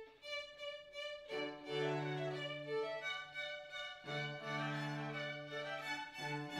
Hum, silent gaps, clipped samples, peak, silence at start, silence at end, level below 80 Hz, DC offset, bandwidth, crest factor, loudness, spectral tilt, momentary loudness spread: none; none; under 0.1%; -28 dBFS; 0 s; 0 s; -80 dBFS; under 0.1%; 14 kHz; 16 dB; -43 LUFS; -5 dB/octave; 6 LU